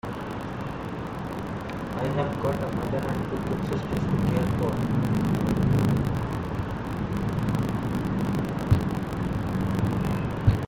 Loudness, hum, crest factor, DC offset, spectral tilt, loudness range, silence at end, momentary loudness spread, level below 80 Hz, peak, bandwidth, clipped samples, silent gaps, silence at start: -27 LUFS; none; 18 dB; under 0.1%; -8 dB/octave; 4 LU; 0 s; 9 LU; -40 dBFS; -8 dBFS; 17 kHz; under 0.1%; none; 0.05 s